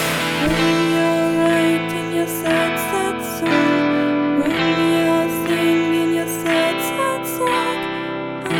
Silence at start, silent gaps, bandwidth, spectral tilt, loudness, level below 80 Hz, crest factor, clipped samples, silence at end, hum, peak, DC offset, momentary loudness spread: 0 s; none; 19 kHz; -4.5 dB/octave; -18 LUFS; -46 dBFS; 14 dB; under 0.1%; 0 s; none; -4 dBFS; under 0.1%; 5 LU